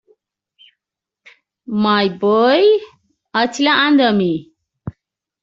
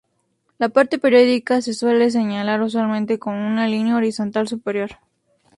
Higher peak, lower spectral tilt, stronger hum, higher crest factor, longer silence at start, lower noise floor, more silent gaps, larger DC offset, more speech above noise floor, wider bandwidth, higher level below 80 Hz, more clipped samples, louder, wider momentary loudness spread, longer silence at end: about the same, -2 dBFS vs -2 dBFS; second, -3 dB/octave vs -5.5 dB/octave; neither; about the same, 16 dB vs 16 dB; first, 1.7 s vs 0.6 s; first, -83 dBFS vs -68 dBFS; neither; neither; first, 69 dB vs 50 dB; second, 7.8 kHz vs 11.5 kHz; first, -58 dBFS vs -64 dBFS; neither; first, -15 LUFS vs -19 LUFS; first, 21 LU vs 9 LU; second, 0.5 s vs 0.65 s